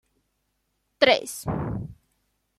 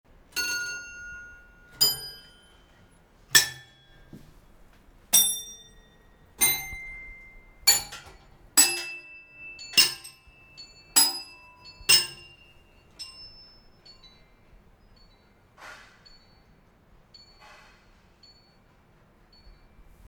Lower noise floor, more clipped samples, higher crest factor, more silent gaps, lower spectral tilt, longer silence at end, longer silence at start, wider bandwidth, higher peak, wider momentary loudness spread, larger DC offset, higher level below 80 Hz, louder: first, -75 dBFS vs -59 dBFS; neither; second, 24 dB vs 30 dB; neither; first, -4 dB/octave vs 1.5 dB/octave; second, 0.65 s vs 4.35 s; first, 1 s vs 0.35 s; second, 14 kHz vs over 20 kHz; second, -4 dBFS vs 0 dBFS; second, 15 LU vs 27 LU; neither; first, -50 dBFS vs -58 dBFS; about the same, -24 LUFS vs -22 LUFS